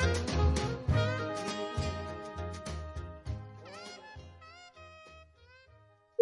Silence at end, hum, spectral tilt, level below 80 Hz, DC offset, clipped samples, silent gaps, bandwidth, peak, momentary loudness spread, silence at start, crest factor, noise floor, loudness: 0 s; none; -5.5 dB/octave; -44 dBFS; under 0.1%; under 0.1%; none; 11.5 kHz; -14 dBFS; 22 LU; 0 s; 22 dB; -62 dBFS; -35 LUFS